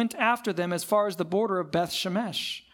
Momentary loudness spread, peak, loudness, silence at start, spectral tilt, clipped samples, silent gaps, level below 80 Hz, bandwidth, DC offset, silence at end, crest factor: 4 LU; -10 dBFS; -27 LUFS; 0 s; -4.5 dB/octave; under 0.1%; none; -68 dBFS; 18 kHz; under 0.1%; 0.15 s; 18 dB